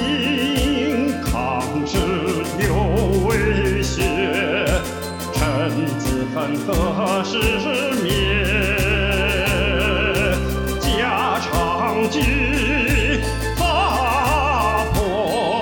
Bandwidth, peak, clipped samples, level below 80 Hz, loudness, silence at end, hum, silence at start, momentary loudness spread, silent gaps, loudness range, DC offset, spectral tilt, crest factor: over 20 kHz; -4 dBFS; under 0.1%; -28 dBFS; -19 LUFS; 0 s; none; 0 s; 4 LU; none; 2 LU; under 0.1%; -5 dB/octave; 14 dB